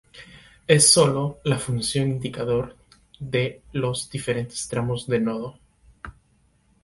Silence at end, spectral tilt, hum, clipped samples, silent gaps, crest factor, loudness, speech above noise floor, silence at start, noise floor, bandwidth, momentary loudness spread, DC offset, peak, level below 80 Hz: 0.75 s; -4 dB/octave; none; under 0.1%; none; 22 dB; -22 LUFS; 40 dB; 0.15 s; -62 dBFS; 12 kHz; 22 LU; under 0.1%; -2 dBFS; -52 dBFS